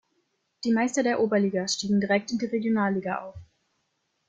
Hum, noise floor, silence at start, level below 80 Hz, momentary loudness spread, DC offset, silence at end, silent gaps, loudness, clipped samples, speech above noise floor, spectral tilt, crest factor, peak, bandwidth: none; -75 dBFS; 0.65 s; -64 dBFS; 9 LU; under 0.1%; 0.85 s; none; -26 LUFS; under 0.1%; 50 dB; -5 dB/octave; 18 dB; -10 dBFS; 9.4 kHz